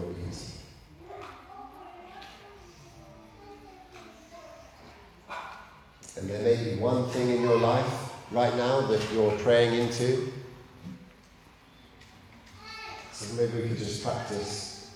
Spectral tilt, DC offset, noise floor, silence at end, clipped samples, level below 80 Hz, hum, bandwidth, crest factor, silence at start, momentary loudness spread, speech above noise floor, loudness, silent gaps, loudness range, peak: -5.5 dB/octave; under 0.1%; -55 dBFS; 0 s; under 0.1%; -58 dBFS; none; 13.5 kHz; 20 dB; 0 s; 25 LU; 29 dB; -28 LUFS; none; 22 LU; -12 dBFS